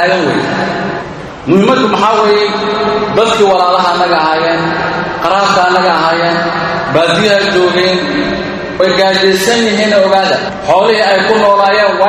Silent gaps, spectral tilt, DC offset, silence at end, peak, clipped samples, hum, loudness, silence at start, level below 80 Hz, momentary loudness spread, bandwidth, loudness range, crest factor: none; -4.5 dB/octave; under 0.1%; 0 s; 0 dBFS; 0.3%; none; -10 LUFS; 0 s; -42 dBFS; 6 LU; 15 kHz; 2 LU; 10 dB